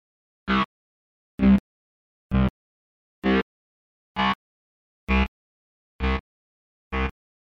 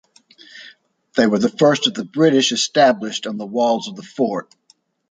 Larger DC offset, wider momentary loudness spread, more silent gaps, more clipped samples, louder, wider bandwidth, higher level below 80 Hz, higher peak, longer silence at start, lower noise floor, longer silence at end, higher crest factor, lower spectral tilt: neither; about the same, 14 LU vs 12 LU; first, 0.65-1.38 s, 1.60-2.30 s, 2.50-3.22 s, 3.42-4.15 s, 4.35-5.07 s, 5.28-5.99 s, 6.20-6.91 s vs none; neither; second, -25 LUFS vs -18 LUFS; second, 6.4 kHz vs 9.6 kHz; first, -34 dBFS vs -66 dBFS; second, -8 dBFS vs -2 dBFS; about the same, 0.45 s vs 0.55 s; first, under -90 dBFS vs -48 dBFS; second, 0.35 s vs 0.7 s; about the same, 18 dB vs 18 dB; first, -8 dB/octave vs -4 dB/octave